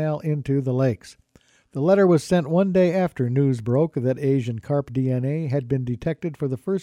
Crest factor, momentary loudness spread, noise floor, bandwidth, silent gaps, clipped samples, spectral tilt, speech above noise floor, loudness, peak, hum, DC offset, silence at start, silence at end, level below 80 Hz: 16 dB; 9 LU; -58 dBFS; 11.5 kHz; none; under 0.1%; -8.5 dB/octave; 37 dB; -22 LUFS; -6 dBFS; none; under 0.1%; 0 s; 0 s; -54 dBFS